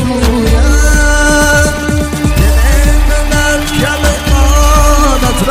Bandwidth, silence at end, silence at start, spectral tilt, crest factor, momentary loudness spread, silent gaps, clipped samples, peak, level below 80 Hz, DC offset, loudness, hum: 16 kHz; 0 s; 0 s; -4.5 dB/octave; 8 dB; 4 LU; none; under 0.1%; 0 dBFS; -10 dBFS; under 0.1%; -10 LUFS; none